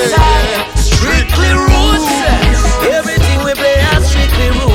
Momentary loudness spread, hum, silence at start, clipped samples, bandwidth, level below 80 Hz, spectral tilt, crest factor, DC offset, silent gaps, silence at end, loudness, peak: 3 LU; none; 0 s; under 0.1%; 17 kHz; -14 dBFS; -4.5 dB/octave; 10 dB; under 0.1%; none; 0 s; -11 LUFS; 0 dBFS